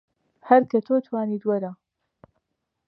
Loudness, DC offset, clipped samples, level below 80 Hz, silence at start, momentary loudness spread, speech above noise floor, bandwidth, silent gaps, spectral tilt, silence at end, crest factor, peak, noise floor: -22 LUFS; under 0.1%; under 0.1%; -76 dBFS; 0.45 s; 9 LU; 56 dB; 5.8 kHz; none; -9.5 dB/octave; 1.15 s; 22 dB; -4 dBFS; -78 dBFS